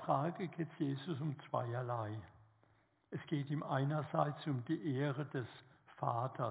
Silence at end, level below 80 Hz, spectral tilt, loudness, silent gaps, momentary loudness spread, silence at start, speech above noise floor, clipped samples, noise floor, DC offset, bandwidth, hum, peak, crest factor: 0 s; -78 dBFS; -7 dB/octave; -40 LUFS; none; 9 LU; 0 s; 34 dB; under 0.1%; -73 dBFS; under 0.1%; 4 kHz; none; -20 dBFS; 20 dB